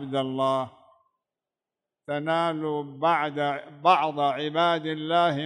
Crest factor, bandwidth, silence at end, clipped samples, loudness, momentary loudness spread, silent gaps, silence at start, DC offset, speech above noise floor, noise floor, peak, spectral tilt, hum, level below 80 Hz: 20 dB; 10 kHz; 0 s; under 0.1%; -25 LUFS; 8 LU; none; 0 s; under 0.1%; 64 dB; -89 dBFS; -8 dBFS; -6 dB/octave; none; -78 dBFS